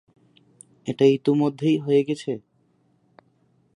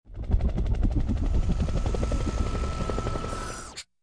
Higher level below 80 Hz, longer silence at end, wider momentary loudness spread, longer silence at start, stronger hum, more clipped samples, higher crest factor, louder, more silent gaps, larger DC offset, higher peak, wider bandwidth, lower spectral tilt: second, -72 dBFS vs -28 dBFS; first, 1.4 s vs 0.2 s; first, 15 LU vs 6 LU; first, 0.85 s vs 0.05 s; neither; neither; about the same, 18 dB vs 14 dB; first, -22 LUFS vs -30 LUFS; neither; neither; first, -6 dBFS vs -12 dBFS; about the same, 10.5 kHz vs 10.5 kHz; about the same, -7.5 dB/octave vs -6.5 dB/octave